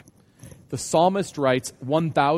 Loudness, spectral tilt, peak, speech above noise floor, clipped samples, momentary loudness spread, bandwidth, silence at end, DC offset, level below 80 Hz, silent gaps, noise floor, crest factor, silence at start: -23 LUFS; -5 dB/octave; -6 dBFS; 27 dB; under 0.1%; 9 LU; 15 kHz; 0 s; under 0.1%; -58 dBFS; none; -49 dBFS; 18 dB; 0.45 s